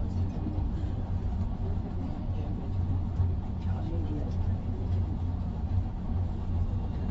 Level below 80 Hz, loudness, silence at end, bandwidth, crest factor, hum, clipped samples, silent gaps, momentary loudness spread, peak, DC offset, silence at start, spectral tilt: -34 dBFS; -33 LUFS; 0 s; 5.2 kHz; 14 dB; none; under 0.1%; none; 3 LU; -16 dBFS; under 0.1%; 0 s; -9.5 dB/octave